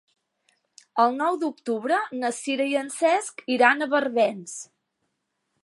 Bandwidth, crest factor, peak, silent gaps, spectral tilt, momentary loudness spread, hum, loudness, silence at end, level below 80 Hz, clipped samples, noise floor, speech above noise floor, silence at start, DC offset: 11.5 kHz; 24 dB; -2 dBFS; none; -3 dB/octave; 10 LU; none; -24 LUFS; 1 s; -84 dBFS; under 0.1%; -77 dBFS; 54 dB; 0.95 s; under 0.1%